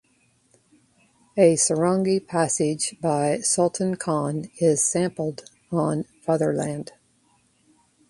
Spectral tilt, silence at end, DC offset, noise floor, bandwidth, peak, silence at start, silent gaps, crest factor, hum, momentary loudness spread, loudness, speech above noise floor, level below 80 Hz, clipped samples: -4.5 dB/octave; 1.25 s; under 0.1%; -64 dBFS; 11.5 kHz; -4 dBFS; 1.35 s; none; 20 dB; none; 11 LU; -23 LUFS; 41 dB; -64 dBFS; under 0.1%